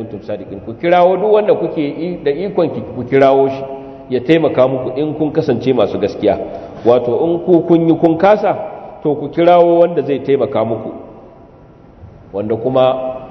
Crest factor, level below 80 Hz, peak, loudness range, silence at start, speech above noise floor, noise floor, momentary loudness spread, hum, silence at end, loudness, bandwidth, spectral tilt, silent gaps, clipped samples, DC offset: 14 dB; -50 dBFS; 0 dBFS; 3 LU; 0 s; 28 dB; -41 dBFS; 14 LU; none; 0 s; -14 LUFS; 6.2 kHz; -8.5 dB/octave; none; under 0.1%; under 0.1%